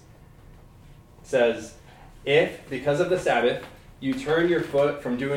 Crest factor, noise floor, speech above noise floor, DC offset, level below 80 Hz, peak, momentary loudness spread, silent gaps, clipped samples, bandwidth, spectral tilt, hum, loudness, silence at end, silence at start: 18 dB; -49 dBFS; 26 dB; under 0.1%; -52 dBFS; -8 dBFS; 12 LU; none; under 0.1%; 16 kHz; -5.5 dB/octave; none; -24 LUFS; 0 s; 0.45 s